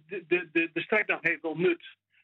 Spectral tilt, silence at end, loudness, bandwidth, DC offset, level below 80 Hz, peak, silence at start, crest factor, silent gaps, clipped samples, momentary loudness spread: -7.5 dB/octave; 0.35 s; -28 LUFS; 4.6 kHz; under 0.1%; -86 dBFS; -12 dBFS; 0.1 s; 18 dB; none; under 0.1%; 3 LU